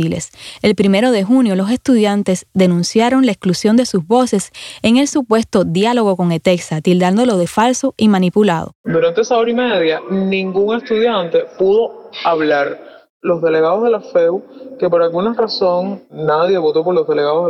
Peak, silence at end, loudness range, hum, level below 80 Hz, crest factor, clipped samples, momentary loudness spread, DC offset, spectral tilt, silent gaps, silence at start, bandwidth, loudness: 0 dBFS; 0 s; 2 LU; none; -54 dBFS; 14 dB; under 0.1%; 7 LU; under 0.1%; -5.5 dB/octave; 8.75-8.84 s, 13.10-13.20 s; 0 s; 14 kHz; -15 LUFS